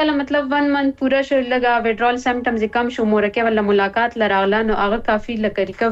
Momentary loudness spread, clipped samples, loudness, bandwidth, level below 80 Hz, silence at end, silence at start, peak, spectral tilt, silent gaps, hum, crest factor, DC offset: 3 LU; under 0.1%; -18 LUFS; 8 kHz; -42 dBFS; 0 s; 0 s; -6 dBFS; -6 dB/octave; none; none; 12 dB; under 0.1%